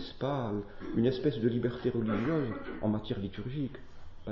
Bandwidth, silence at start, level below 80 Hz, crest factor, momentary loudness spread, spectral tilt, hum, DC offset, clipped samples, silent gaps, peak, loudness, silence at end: 6.2 kHz; 0 s; -50 dBFS; 16 dB; 8 LU; -9 dB/octave; none; under 0.1%; under 0.1%; none; -18 dBFS; -33 LUFS; 0 s